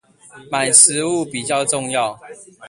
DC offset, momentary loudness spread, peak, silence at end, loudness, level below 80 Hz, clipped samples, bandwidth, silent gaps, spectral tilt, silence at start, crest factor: under 0.1%; 13 LU; 0 dBFS; 0 s; -15 LUFS; -62 dBFS; under 0.1%; 16 kHz; none; -1.5 dB/octave; 0.35 s; 18 dB